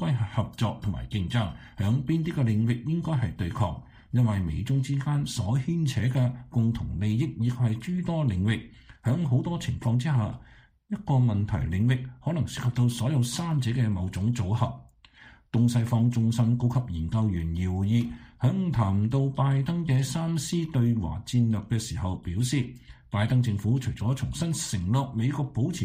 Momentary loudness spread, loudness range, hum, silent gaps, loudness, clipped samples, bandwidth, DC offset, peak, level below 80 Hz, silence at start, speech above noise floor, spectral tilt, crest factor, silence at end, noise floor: 6 LU; 2 LU; none; none; -27 LUFS; under 0.1%; 15.5 kHz; under 0.1%; -12 dBFS; -46 dBFS; 0 s; 28 dB; -6.5 dB/octave; 14 dB; 0 s; -53 dBFS